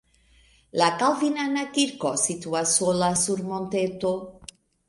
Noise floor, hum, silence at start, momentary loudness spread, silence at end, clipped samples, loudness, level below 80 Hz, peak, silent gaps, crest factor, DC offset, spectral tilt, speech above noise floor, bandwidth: -59 dBFS; none; 0.75 s; 7 LU; 0.45 s; under 0.1%; -24 LUFS; -60 dBFS; -6 dBFS; none; 20 dB; under 0.1%; -3 dB/octave; 35 dB; 11.5 kHz